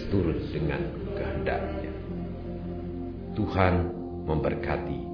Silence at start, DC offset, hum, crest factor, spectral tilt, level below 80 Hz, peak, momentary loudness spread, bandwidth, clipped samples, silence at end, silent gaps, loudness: 0 s; under 0.1%; none; 22 dB; -9.5 dB/octave; -40 dBFS; -8 dBFS; 11 LU; 5.4 kHz; under 0.1%; 0 s; none; -30 LUFS